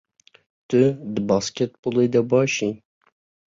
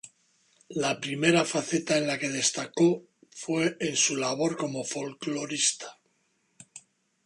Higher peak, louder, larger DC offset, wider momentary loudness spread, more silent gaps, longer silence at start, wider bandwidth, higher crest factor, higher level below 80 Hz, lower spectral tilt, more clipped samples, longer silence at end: about the same, -6 dBFS vs -8 dBFS; first, -21 LUFS vs -27 LUFS; neither; second, 8 LU vs 14 LU; first, 1.79-1.83 s vs none; first, 0.7 s vs 0.05 s; second, 7.8 kHz vs 11.5 kHz; about the same, 16 dB vs 20 dB; first, -60 dBFS vs -74 dBFS; first, -5.5 dB/octave vs -3 dB/octave; neither; first, 0.75 s vs 0.45 s